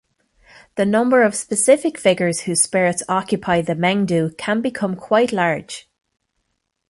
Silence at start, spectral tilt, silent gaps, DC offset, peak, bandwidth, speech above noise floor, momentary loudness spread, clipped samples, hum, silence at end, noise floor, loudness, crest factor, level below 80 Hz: 0.75 s; -4 dB/octave; none; under 0.1%; -2 dBFS; 11.5 kHz; 55 dB; 7 LU; under 0.1%; none; 1.1 s; -73 dBFS; -18 LUFS; 18 dB; -58 dBFS